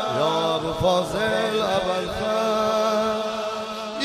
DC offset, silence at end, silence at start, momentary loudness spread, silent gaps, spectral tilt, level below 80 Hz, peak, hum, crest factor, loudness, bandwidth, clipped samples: under 0.1%; 0 s; 0 s; 6 LU; none; -4.5 dB/octave; -48 dBFS; -8 dBFS; none; 14 dB; -23 LUFS; 15.5 kHz; under 0.1%